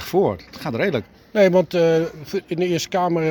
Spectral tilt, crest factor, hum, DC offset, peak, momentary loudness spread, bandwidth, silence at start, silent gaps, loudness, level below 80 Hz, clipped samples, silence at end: -6 dB/octave; 16 dB; none; under 0.1%; -4 dBFS; 12 LU; 19 kHz; 0 s; none; -20 LUFS; -54 dBFS; under 0.1%; 0 s